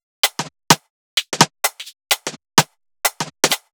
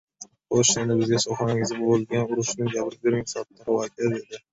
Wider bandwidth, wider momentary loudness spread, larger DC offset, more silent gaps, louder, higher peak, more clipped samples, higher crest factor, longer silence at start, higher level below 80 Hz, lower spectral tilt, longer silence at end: first, over 20 kHz vs 8.4 kHz; second, 7 LU vs 12 LU; neither; first, 0.90-1.17 s vs none; first, -18 LUFS vs -24 LUFS; first, 0 dBFS vs -6 dBFS; neither; about the same, 20 dB vs 18 dB; about the same, 0.25 s vs 0.2 s; about the same, -60 dBFS vs -58 dBFS; second, -2 dB/octave vs -4.5 dB/octave; about the same, 0.15 s vs 0.15 s